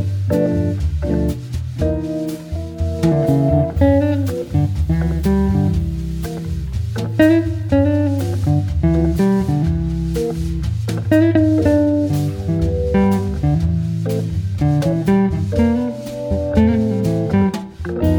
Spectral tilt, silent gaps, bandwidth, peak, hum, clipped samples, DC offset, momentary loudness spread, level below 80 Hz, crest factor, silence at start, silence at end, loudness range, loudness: -8.5 dB/octave; none; 18.5 kHz; -2 dBFS; none; under 0.1%; under 0.1%; 9 LU; -28 dBFS; 14 dB; 0 s; 0 s; 2 LU; -18 LUFS